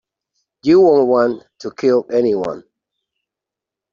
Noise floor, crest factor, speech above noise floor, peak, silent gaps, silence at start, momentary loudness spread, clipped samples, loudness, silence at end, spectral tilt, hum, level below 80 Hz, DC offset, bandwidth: -85 dBFS; 14 dB; 71 dB; -2 dBFS; none; 0.65 s; 17 LU; under 0.1%; -15 LUFS; 1.3 s; -7 dB/octave; none; -60 dBFS; under 0.1%; 7.2 kHz